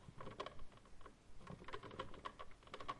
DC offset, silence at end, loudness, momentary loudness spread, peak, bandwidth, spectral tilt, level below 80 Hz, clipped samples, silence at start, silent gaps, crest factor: under 0.1%; 0 s; -55 LUFS; 12 LU; -32 dBFS; 11 kHz; -5 dB/octave; -64 dBFS; under 0.1%; 0 s; none; 20 dB